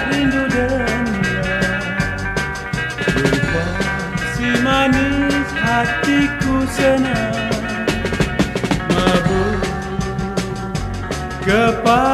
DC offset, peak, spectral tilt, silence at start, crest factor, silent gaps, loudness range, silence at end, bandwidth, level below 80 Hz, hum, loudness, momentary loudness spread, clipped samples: under 0.1%; -2 dBFS; -5.5 dB/octave; 0 s; 16 dB; none; 3 LU; 0 s; 14.5 kHz; -32 dBFS; none; -18 LUFS; 7 LU; under 0.1%